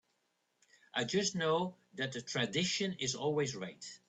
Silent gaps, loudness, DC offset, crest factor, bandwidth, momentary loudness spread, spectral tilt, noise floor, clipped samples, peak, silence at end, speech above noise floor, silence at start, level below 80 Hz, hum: none; -35 LUFS; under 0.1%; 18 dB; 9.2 kHz; 8 LU; -3.5 dB/octave; -80 dBFS; under 0.1%; -20 dBFS; 0.1 s; 44 dB; 0.95 s; -74 dBFS; none